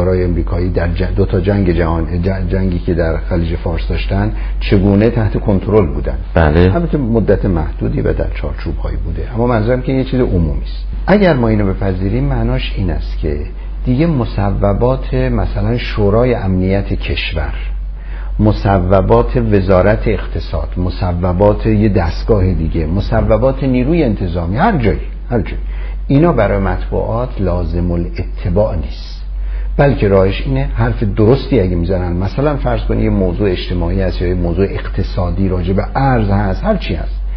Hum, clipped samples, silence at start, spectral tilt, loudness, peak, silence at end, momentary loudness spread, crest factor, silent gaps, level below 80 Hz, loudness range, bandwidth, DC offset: none; under 0.1%; 0 s; -7 dB/octave; -15 LUFS; 0 dBFS; 0 s; 10 LU; 14 dB; none; -20 dBFS; 3 LU; 5.8 kHz; under 0.1%